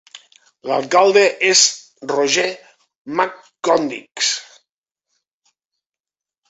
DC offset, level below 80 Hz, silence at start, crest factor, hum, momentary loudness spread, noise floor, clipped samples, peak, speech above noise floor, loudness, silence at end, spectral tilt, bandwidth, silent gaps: under 0.1%; -68 dBFS; 0.15 s; 20 dB; none; 14 LU; -89 dBFS; under 0.1%; 0 dBFS; 73 dB; -16 LUFS; 2.1 s; -1 dB/octave; 8.4 kHz; 2.96-3.05 s